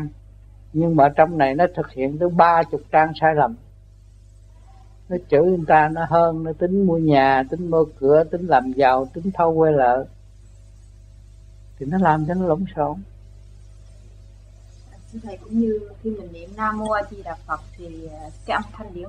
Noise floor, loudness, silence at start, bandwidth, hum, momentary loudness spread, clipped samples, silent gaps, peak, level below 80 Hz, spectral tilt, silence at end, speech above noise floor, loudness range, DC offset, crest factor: -46 dBFS; -19 LUFS; 0 s; 9.4 kHz; 50 Hz at -45 dBFS; 19 LU; under 0.1%; none; 0 dBFS; -44 dBFS; -8.5 dB/octave; 0 s; 27 dB; 10 LU; under 0.1%; 20 dB